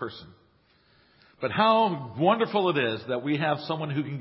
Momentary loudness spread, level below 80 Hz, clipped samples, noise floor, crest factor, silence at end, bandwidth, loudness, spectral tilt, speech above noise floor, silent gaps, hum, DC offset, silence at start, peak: 10 LU; -66 dBFS; under 0.1%; -63 dBFS; 18 dB; 0 s; 5.8 kHz; -26 LUFS; -10.5 dB/octave; 37 dB; none; none; under 0.1%; 0 s; -8 dBFS